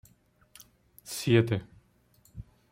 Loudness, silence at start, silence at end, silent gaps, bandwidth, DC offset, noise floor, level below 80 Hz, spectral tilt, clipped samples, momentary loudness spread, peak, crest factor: -28 LUFS; 1.05 s; 0.3 s; none; 16.5 kHz; under 0.1%; -64 dBFS; -60 dBFS; -6 dB/octave; under 0.1%; 25 LU; -10 dBFS; 22 dB